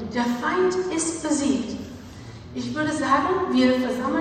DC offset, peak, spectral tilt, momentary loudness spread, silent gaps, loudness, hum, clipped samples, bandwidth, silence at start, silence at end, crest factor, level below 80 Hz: under 0.1%; -8 dBFS; -4 dB/octave; 16 LU; none; -23 LUFS; none; under 0.1%; 13 kHz; 0 s; 0 s; 16 dB; -54 dBFS